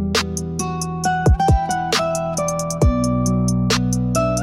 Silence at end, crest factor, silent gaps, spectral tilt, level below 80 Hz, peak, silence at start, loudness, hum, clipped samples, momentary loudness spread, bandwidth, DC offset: 0 s; 12 dB; none; -5 dB/octave; -26 dBFS; -6 dBFS; 0 s; -19 LUFS; none; under 0.1%; 7 LU; 16 kHz; under 0.1%